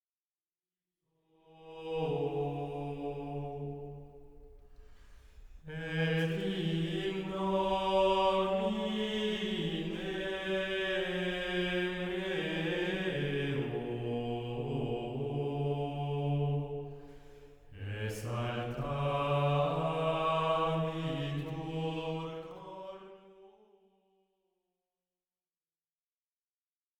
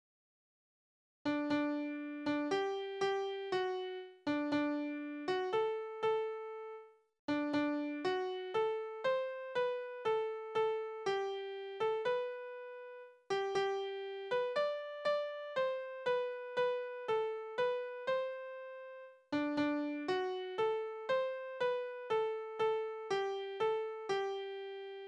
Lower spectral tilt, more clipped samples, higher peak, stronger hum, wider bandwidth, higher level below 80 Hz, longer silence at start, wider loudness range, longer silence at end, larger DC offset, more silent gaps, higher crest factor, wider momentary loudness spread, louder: first, -6.5 dB/octave vs -5 dB/octave; neither; first, -18 dBFS vs -24 dBFS; neither; first, 14 kHz vs 9.8 kHz; first, -56 dBFS vs -80 dBFS; first, 1.5 s vs 1.25 s; first, 10 LU vs 1 LU; first, 3.5 s vs 0 s; neither; second, none vs 7.19-7.28 s; about the same, 18 dB vs 14 dB; first, 13 LU vs 9 LU; first, -34 LUFS vs -38 LUFS